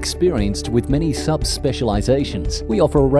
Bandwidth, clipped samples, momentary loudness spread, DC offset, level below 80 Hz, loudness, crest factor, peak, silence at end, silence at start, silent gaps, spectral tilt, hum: 11 kHz; under 0.1%; 4 LU; under 0.1%; -28 dBFS; -19 LUFS; 14 dB; -4 dBFS; 0 s; 0 s; none; -6 dB/octave; none